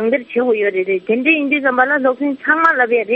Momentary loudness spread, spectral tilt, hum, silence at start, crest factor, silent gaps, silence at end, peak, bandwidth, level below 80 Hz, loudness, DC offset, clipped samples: 5 LU; -2 dB/octave; none; 0 s; 14 dB; none; 0 s; 0 dBFS; 6.6 kHz; -64 dBFS; -15 LUFS; under 0.1%; under 0.1%